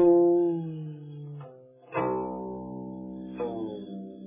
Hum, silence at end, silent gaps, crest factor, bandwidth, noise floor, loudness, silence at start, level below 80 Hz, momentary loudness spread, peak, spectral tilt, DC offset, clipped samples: none; 0 s; none; 18 dB; 3.7 kHz; -50 dBFS; -30 LUFS; 0 s; -62 dBFS; 19 LU; -10 dBFS; -9 dB/octave; under 0.1%; under 0.1%